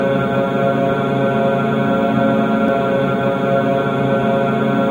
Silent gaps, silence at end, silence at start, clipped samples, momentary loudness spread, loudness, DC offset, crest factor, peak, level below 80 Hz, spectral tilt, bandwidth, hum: none; 0 s; 0 s; under 0.1%; 2 LU; -16 LUFS; under 0.1%; 12 dB; -4 dBFS; -48 dBFS; -8 dB/octave; 16.5 kHz; none